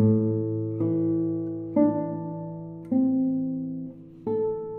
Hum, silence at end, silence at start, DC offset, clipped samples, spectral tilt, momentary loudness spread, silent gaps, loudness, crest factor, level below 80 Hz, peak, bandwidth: none; 0 s; 0 s; under 0.1%; under 0.1%; -14 dB/octave; 13 LU; none; -27 LUFS; 16 dB; -64 dBFS; -10 dBFS; 2.3 kHz